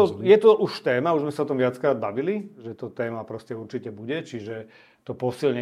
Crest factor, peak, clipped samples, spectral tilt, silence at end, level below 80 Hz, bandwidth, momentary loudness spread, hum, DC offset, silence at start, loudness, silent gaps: 20 dB; -4 dBFS; under 0.1%; -7 dB/octave; 0 s; -72 dBFS; 11.5 kHz; 19 LU; none; under 0.1%; 0 s; -23 LUFS; none